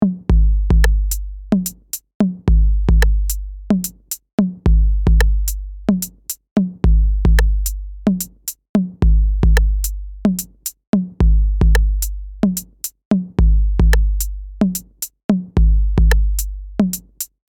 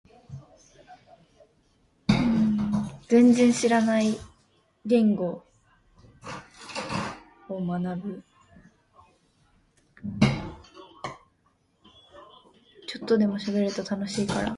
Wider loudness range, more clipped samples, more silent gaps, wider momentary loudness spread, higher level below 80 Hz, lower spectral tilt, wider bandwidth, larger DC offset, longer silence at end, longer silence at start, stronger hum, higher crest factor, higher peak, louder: second, 2 LU vs 12 LU; neither; first, 2.14-2.20 s, 4.33-4.38 s, 6.51-6.56 s, 8.69-8.74 s, 10.87-10.93 s, 13.05-13.11 s, 15.24-15.29 s vs none; second, 10 LU vs 22 LU; first, -16 dBFS vs -52 dBFS; about the same, -6 dB/octave vs -6 dB/octave; first, 18.5 kHz vs 11.5 kHz; neither; first, 0.25 s vs 0 s; second, 0 s vs 0.3 s; neither; second, 16 dB vs 22 dB; first, 0 dBFS vs -6 dBFS; first, -18 LUFS vs -25 LUFS